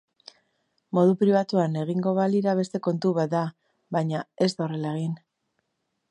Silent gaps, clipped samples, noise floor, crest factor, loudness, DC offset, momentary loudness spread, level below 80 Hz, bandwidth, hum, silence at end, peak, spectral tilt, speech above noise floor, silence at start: none; under 0.1%; -78 dBFS; 16 dB; -25 LUFS; under 0.1%; 9 LU; -74 dBFS; 9.8 kHz; none; 0.95 s; -8 dBFS; -7.5 dB/octave; 54 dB; 0.95 s